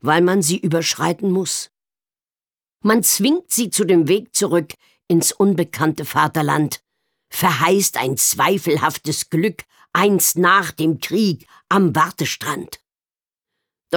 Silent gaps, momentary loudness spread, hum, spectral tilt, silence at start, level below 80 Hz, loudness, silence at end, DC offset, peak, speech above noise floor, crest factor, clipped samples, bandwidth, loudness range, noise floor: none; 9 LU; none; -4 dB/octave; 0.05 s; -64 dBFS; -17 LUFS; 0 s; under 0.1%; -2 dBFS; over 72 dB; 16 dB; under 0.1%; over 20 kHz; 2 LU; under -90 dBFS